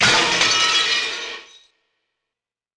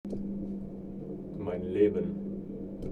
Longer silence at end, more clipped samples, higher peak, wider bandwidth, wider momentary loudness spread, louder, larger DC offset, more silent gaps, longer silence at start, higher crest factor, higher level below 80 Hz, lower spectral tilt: first, 1.35 s vs 0 s; neither; first, -4 dBFS vs -12 dBFS; first, 10.5 kHz vs 4.4 kHz; first, 16 LU vs 13 LU; first, -16 LUFS vs -34 LUFS; neither; neither; about the same, 0 s vs 0.05 s; about the same, 16 dB vs 20 dB; about the same, -54 dBFS vs -52 dBFS; second, -0.5 dB/octave vs -10 dB/octave